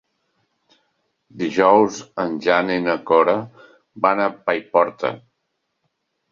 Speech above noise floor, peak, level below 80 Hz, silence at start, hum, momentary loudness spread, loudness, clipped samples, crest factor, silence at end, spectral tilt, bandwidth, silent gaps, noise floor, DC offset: 56 dB; -2 dBFS; -64 dBFS; 1.35 s; none; 12 LU; -19 LUFS; under 0.1%; 20 dB; 1.15 s; -5.5 dB/octave; 7.4 kHz; none; -74 dBFS; under 0.1%